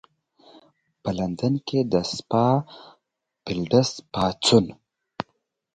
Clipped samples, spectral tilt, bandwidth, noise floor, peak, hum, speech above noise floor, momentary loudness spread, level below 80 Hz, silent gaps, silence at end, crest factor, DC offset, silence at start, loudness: under 0.1%; -5.5 dB/octave; 9.4 kHz; -76 dBFS; -4 dBFS; none; 54 dB; 17 LU; -54 dBFS; none; 0.5 s; 22 dB; under 0.1%; 1.05 s; -23 LUFS